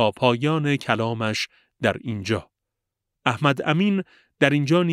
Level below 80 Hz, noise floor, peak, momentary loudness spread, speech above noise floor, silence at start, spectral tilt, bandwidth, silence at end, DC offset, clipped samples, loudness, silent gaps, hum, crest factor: -62 dBFS; -83 dBFS; -2 dBFS; 8 LU; 61 dB; 0 s; -6 dB/octave; 13.5 kHz; 0 s; under 0.1%; under 0.1%; -23 LUFS; none; none; 20 dB